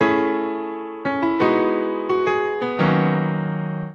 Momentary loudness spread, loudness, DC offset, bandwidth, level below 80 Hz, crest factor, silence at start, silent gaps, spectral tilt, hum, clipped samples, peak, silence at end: 8 LU; -21 LUFS; under 0.1%; 6.8 kHz; -58 dBFS; 16 dB; 0 s; none; -8.5 dB/octave; none; under 0.1%; -4 dBFS; 0 s